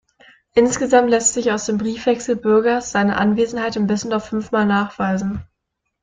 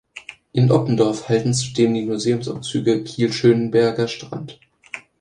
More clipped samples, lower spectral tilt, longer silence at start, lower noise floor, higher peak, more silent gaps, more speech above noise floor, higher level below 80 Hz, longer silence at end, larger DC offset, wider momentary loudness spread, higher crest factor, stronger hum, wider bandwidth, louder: neither; second, -4.5 dB/octave vs -6 dB/octave; first, 0.55 s vs 0.15 s; first, -76 dBFS vs -41 dBFS; about the same, 0 dBFS vs -2 dBFS; neither; first, 58 dB vs 22 dB; first, -50 dBFS vs -56 dBFS; first, 0.6 s vs 0.2 s; neither; second, 7 LU vs 19 LU; about the same, 18 dB vs 18 dB; neither; second, 9.6 kHz vs 11 kHz; about the same, -18 LUFS vs -19 LUFS